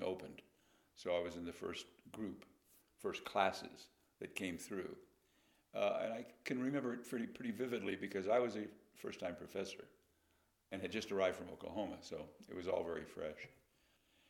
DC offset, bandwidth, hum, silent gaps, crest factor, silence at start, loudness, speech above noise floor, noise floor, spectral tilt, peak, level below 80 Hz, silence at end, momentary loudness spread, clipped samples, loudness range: under 0.1%; 17.5 kHz; none; none; 26 dB; 0 s; -43 LUFS; 35 dB; -78 dBFS; -5 dB/octave; -18 dBFS; -76 dBFS; 0.8 s; 15 LU; under 0.1%; 3 LU